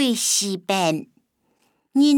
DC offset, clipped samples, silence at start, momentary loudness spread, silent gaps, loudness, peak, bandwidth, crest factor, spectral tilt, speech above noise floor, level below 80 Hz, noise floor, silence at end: under 0.1%; under 0.1%; 0 s; 7 LU; none; -21 LUFS; -6 dBFS; 19 kHz; 16 dB; -3 dB/octave; 45 dB; -80 dBFS; -67 dBFS; 0 s